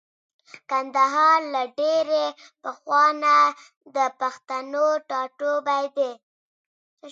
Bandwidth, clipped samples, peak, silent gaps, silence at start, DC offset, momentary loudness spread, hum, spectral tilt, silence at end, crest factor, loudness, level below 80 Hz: 7.8 kHz; under 0.1%; -6 dBFS; 3.77-3.81 s, 6.23-6.97 s; 0.55 s; under 0.1%; 12 LU; none; -1.5 dB/octave; 0 s; 16 dB; -22 LUFS; -88 dBFS